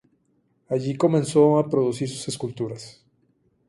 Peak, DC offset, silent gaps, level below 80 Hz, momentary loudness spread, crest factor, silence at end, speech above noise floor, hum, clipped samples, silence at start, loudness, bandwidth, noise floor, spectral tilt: -6 dBFS; under 0.1%; none; -64 dBFS; 14 LU; 18 dB; 0.8 s; 45 dB; none; under 0.1%; 0.7 s; -23 LUFS; 11.5 kHz; -67 dBFS; -6.5 dB/octave